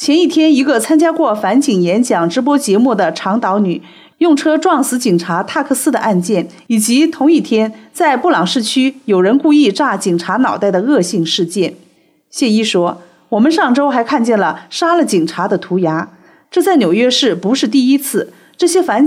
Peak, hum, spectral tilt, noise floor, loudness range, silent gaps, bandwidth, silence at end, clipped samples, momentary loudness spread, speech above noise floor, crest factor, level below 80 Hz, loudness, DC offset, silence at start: -2 dBFS; none; -4.5 dB/octave; -51 dBFS; 2 LU; none; 16 kHz; 0 s; under 0.1%; 7 LU; 39 dB; 10 dB; -68 dBFS; -13 LUFS; under 0.1%; 0 s